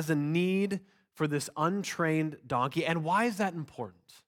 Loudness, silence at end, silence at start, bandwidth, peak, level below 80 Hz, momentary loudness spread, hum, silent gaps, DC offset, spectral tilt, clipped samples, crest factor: -31 LUFS; 0.35 s; 0 s; 17.5 kHz; -14 dBFS; -72 dBFS; 11 LU; none; none; under 0.1%; -5.5 dB/octave; under 0.1%; 16 dB